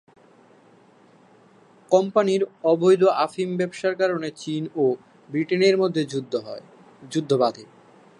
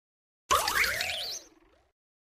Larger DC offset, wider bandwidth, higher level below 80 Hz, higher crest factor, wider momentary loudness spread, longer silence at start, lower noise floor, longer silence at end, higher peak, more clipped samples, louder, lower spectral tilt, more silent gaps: neither; second, 11 kHz vs 15.5 kHz; second, -74 dBFS vs -56 dBFS; about the same, 20 dB vs 20 dB; about the same, 12 LU vs 11 LU; first, 1.9 s vs 0.5 s; second, -54 dBFS vs -61 dBFS; second, 0.55 s vs 0.9 s; first, -4 dBFS vs -12 dBFS; neither; first, -22 LUFS vs -28 LUFS; first, -6 dB/octave vs 0 dB/octave; neither